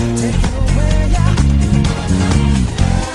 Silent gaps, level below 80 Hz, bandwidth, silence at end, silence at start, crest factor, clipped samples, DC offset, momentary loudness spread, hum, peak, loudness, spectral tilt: none; -16 dBFS; 11.5 kHz; 0 s; 0 s; 12 dB; under 0.1%; under 0.1%; 3 LU; none; 0 dBFS; -15 LUFS; -6 dB/octave